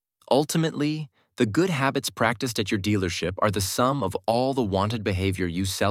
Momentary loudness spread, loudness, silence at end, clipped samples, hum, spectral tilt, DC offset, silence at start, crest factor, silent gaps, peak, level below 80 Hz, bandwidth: 4 LU; -25 LUFS; 0 s; under 0.1%; none; -5 dB/octave; under 0.1%; 0.3 s; 20 dB; none; -6 dBFS; -54 dBFS; 16.5 kHz